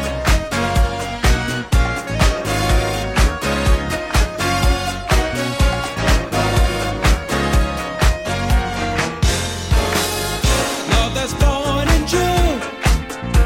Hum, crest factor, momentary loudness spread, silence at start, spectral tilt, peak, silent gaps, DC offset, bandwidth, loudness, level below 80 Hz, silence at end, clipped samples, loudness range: none; 14 dB; 3 LU; 0 s; -4.5 dB/octave; -2 dBFS; none; under 0.1%; 16.5 kHz; -18 LUFS; -20 dBFS; 0 s; under 0.1%; 1 LU